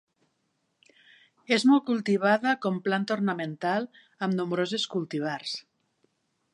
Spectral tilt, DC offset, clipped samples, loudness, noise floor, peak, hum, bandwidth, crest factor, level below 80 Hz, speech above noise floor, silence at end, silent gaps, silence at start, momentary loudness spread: -5.5 dB/octave; under 0.1%; under 0.1%; -27 LUFS; -76 dBFS; -8 dBFS; none; 11 kHz; 20 dB; -80 dBFS; 49 dB; 0.95 s; none; 1.5 s; 11 LU